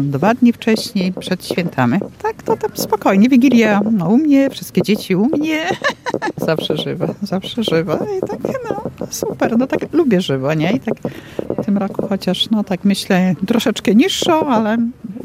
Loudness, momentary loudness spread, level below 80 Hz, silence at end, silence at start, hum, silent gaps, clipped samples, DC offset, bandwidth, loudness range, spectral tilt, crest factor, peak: -16 LUFS; 10 LU; -52 dBFS; 0 s; 0 s; none; none; under 0.1%; under 0.1%; 16 kHz; 5 LU; -5.5 dB/octave; 16 dB; 0 dBFS